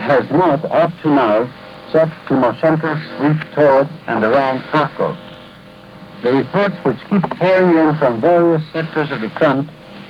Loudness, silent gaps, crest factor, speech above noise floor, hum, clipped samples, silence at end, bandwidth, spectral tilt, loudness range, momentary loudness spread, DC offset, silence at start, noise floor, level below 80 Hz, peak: -15 LUFS; none; 14 dB; 24 dB; none; under 0.1%; 0 s; 10 kHz; -8.5 dB/octave; 3 LU; 9 LU; under 0.1%; 0 s; -39 dBFS; -54 dBFS; -2 dBFS